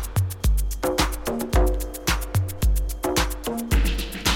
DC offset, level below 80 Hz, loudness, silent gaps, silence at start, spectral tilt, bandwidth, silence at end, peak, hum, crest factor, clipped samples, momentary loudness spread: under 0.1%; -26 dBFS; -25 LUFS; none; 0 s; -4.5 dB/octave; 17 kHz; 0 s; -6 dBFS; none; 18 dB; under 0.1%; 4 LU